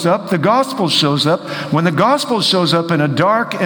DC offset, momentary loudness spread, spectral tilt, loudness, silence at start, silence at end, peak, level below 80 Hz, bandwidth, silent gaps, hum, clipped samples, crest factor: under 0.1%; 3 LU; -5 dB/octave; -14 LUFS; 0 s; 0 s; 0 dBFS; -58 dBFS; over 20 kHz; none; none; under 0.1%; 14 dB